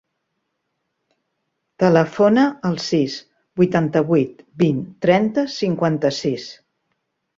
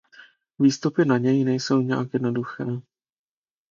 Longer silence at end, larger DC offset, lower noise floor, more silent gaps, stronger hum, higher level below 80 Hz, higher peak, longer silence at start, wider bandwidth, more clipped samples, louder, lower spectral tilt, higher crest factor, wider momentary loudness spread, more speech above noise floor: about the same, 0.85 s vs 0.9 s; neither; first, -75 dBFS vs -52 dBFS; neither; neither; first, -60 dBFS vs -68 dBFS; first, -2 dBFS vs -6 dBFS; first, 1.8 s vs 0.6 s; about the same, 7.6 kHz vs 7.4 kHz; neither; first, -19 LUFS vs -23 LUFS; about the same, -6.5 dB/octave vs -6.5 dB/octave; about the same, 18 dB vs 18 dB; about the same, 10 LU vs 10 LU; first, 57 dB vs 30 dB